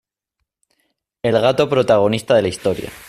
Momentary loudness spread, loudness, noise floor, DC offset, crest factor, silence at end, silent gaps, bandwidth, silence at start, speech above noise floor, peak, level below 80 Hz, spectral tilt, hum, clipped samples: 8 LU; -17 LUFS; -77 dBFS; under 0.1%; 16 dB; 0.05 s; none; 15 kHz; 1.25 s; 61 dB; -4 dBFS; -52 dBFS; -5.5 dB/octave; none; under 0.1%